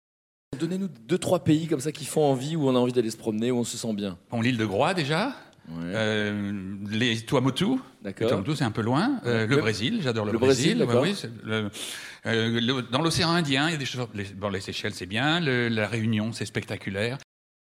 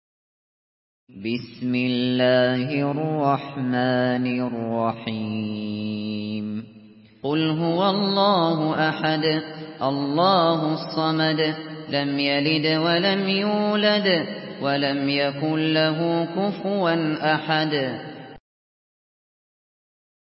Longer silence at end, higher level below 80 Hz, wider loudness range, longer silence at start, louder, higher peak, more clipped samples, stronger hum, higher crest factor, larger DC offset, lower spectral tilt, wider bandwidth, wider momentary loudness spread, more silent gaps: second, 0.5 s vs 2 s; first, -60 dBFS vs -66 dBFS; about the same, 3 LU vs 5 LU; second, 0.5 s vs 1.15 s; second, -26 LUFS vs -22 LUFS; about the same, -6 dBFS vs -6 dBFS; neither; neither; about the same, 20 dB vs 18 dB; neither; second, -5 dB/octave vs -10.5 dB/octave; first, 16 kHz vs 5.8 kHz; about the same, 9 LU vs 10 LU; neither